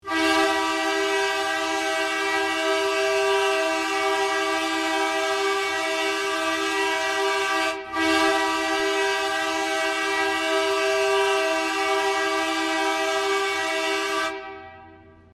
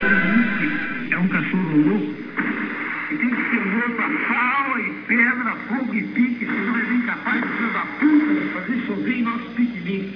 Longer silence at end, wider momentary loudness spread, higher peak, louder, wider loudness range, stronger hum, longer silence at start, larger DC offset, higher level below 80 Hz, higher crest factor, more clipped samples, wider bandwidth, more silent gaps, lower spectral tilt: first, 0.25 s vs 0 s; second, 3 LU vs 7 LU; second, -8 dBFS vs -4 dBFS; about the same, -23 LUFS vs -21 LUFS; about the same, 1 LU vs 1 LU; neither; about the same, 0.05 s vs 0 s; neither; about the same, -62 dBFS vs -58 dBFS; about the same, 16 dB vs 16 dB; neither; first, 15.5 kHz vs 5.4 kHz; neither; second, -1 dB/octave vs -8.5 dB/octave